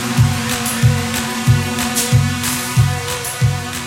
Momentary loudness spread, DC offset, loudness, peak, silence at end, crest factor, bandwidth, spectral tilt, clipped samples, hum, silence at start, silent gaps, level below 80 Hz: 3 LU; under 0.1%; -16 LUFS; -2 dBFS; 0 s; 14 dB; 17 kHz; -4 dB/octave; under 0.1%; none; 0 s; none; -34 dBFS